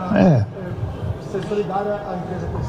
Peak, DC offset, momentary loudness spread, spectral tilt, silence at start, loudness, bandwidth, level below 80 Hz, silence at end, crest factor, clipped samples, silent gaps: -4 dBFS; under 0.1%; 12 LU; -8.5 dB/octave; 0 s; -22 LUFS; 9 kHz; -40 dBFS; 0 s; 18 dB; under 0.1%; none